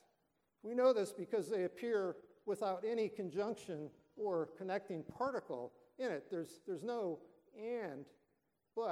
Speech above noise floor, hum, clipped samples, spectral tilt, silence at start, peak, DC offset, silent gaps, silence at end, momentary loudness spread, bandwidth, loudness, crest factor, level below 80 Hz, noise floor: 43 dB; none; under 0.1%; -6 dB/octave; 0.65 s; -22 dBFS; under 0.1%; none; 0 s; 11 LU; 14 kHz; -41 LUFS; 20 dB; -84 dBFS; -83 dBFS